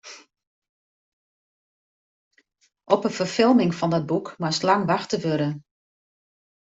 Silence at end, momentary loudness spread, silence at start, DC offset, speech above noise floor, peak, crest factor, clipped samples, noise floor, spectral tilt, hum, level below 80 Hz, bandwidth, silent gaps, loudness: 1.15 s; 9 LU; 0.05 s; under 0.1%; over 68 dB; -4 dBFS; 22 dB; under 0.1%; under -90 dBFS; -5.5 dB/octave; none; -66 dBFS; 8 kHz; 0.47-0.62 s, 0.69-2.31 s; -23 LUFS